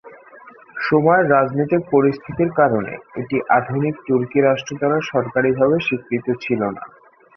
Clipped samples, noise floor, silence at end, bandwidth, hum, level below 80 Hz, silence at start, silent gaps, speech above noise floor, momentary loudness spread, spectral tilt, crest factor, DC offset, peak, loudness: under 0.1%; -44 dBFS; 0.5 s; 6.4 kHz; none; -56 dBFS; 0.05 s; none; 26 dB; 9 LU; -7 dB/octave; 16 dB; under 0.1%; -2 dBFS; -18 LUFS